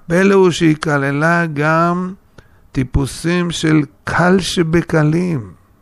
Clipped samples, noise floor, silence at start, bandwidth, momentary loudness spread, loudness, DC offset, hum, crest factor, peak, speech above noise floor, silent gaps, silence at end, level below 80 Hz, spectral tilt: under 0.1%; -45 dBFS; 0.1 s; 13 kHz; 9 LU; -15 LUFS; under 0.1%; none; 14 dB; 0 dBFS; 31 dB; none; 0.3 s; -34 dBFS; -6 dB/octave